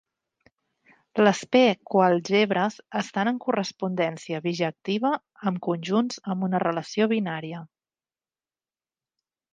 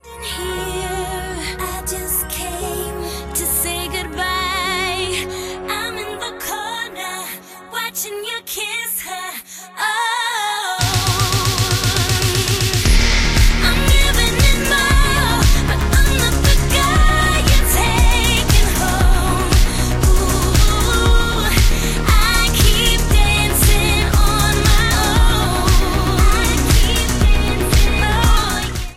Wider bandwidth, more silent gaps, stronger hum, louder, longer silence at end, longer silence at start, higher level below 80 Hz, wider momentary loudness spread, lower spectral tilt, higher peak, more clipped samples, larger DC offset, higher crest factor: second, 9.4 kHz vs 16.5 kHz; neither; neither; second, -25 LUFS vs -16 LUFS; first, 1.85 s vs 0 s; first, 1.15 s vs 0.05 s; second, -76 dBFS vs -18 dBFS; about the same, 10 LU vs 10 LU; first, -5.5 dB/octave vs -3.5 dB/octave; second, -4 dBFS vs 0 dBFS; neither; neither; first, 22 dB vs 14 dB